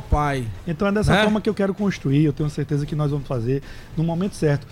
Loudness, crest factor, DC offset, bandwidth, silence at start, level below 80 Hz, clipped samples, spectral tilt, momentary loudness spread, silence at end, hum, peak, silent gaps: -22 LUFS; 14 dB; under 0.1%; 13 kHz; 0 s; -34 dBFS; under 0.1%; -7 dB/octave; 8 LU; 0.05 s; none; -8 dBFS; none